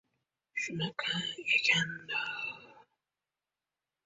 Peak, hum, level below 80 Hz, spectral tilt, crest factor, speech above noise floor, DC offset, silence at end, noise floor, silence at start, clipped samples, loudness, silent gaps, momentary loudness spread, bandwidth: -14 dBFS; none; -76 dBFS; -2.5 dB/octave; 22 dB; over 57 dB; under 0.1%; 1.25 s; under -90 dBFS; 0.55 s; under 0.1%; -32 LUFS; none; 14 LU; 8 kHz